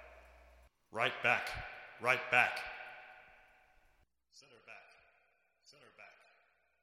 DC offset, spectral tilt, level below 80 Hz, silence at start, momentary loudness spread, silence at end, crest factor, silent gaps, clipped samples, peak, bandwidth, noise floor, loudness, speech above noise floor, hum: under 0.1%; -3 dB/octave; -66 dBFS; 0 s; 27 LU; 0.75 s; 28 dB; none; under 0.1%; -14 dBFS; 16 kHz; -75 dBFS; -34 LUFS; 41 dB; none